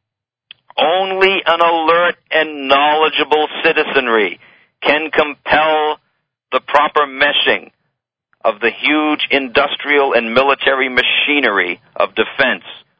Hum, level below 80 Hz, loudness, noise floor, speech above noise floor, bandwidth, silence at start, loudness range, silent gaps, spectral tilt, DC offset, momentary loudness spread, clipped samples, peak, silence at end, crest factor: none; -54 dBFS; -14 LUFS; -81 dBFS; 67 dB; 8 kHz; 0.75 s; 2 LU; none; -5 dB/octave; under 0.1%; 8 LU; under 0.1%; 0 dBFS; 0.2 s; 16 dB